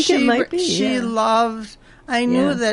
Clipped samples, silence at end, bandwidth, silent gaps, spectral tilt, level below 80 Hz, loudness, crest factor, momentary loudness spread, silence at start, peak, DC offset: under 0.1%; 0 s; 11.5 kHz; none; -4 dB/octave; -52 dBFS; -18 LUFS; 14 dB; 7 LU; 0 s; -4 dBFS; under 0.1%